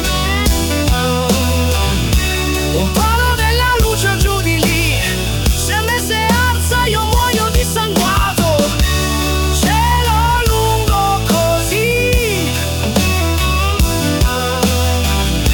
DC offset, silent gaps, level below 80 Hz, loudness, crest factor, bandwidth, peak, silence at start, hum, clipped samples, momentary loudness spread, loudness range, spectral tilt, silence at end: 0.2%; none; -20 dBFS; -14 LUFS; 14 dB; 19 kHz; 0 dBFS; 0 s; none; under 0.1%; 2 LU; 1 LU; -4 dB/octave; 0 s